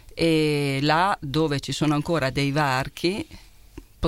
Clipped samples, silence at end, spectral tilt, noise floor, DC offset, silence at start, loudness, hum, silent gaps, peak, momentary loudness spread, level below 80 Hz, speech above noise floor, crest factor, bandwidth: under 0.1%; 0 s; -5.5 dB/octave; -46 dBFS; under 0.1%; 0.1 s; -23 LUFS; none; none; -6 dBFS; 6 LU; -46 dBFS; 23 dB; 18 dB; 16.5 kHz